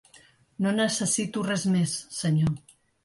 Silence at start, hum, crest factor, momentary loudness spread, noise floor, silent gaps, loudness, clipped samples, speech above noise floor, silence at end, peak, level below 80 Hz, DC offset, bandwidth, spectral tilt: 0.6 s; none; 14 dB; 5 LU; -57 dBFS; none; -26 LUFS; under 0.1%; 32 dB; 0.45 s; -12 dBFS; -58 dBFS; under 0.1%; 11.5 kHz; -4.5 dB/octave